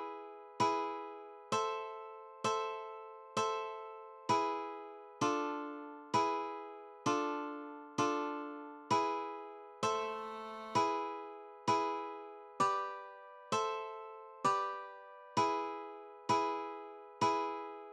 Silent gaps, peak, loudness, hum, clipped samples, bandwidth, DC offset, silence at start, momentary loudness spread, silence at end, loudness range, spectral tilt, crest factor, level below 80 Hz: none; -20 dBFS; -37 LUFS; none; under 0.1%; 12 kHz; under 0.1%; 0 s; 15 LU; 0 s; 2 LU; -4 dB/octave; 18 dB; -84 dBFS